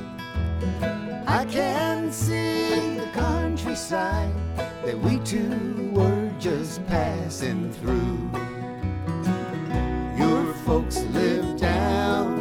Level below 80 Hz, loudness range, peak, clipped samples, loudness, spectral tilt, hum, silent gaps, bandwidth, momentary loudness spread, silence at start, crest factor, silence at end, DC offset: -36 dBFS; 3 LU; -8 dBFS; under 0.1%; -25 LUFS; -6 dB/octave; none; none; 17.5 kHz; 7 LU; 0 s; 16 dB; 0 s; under 0.1%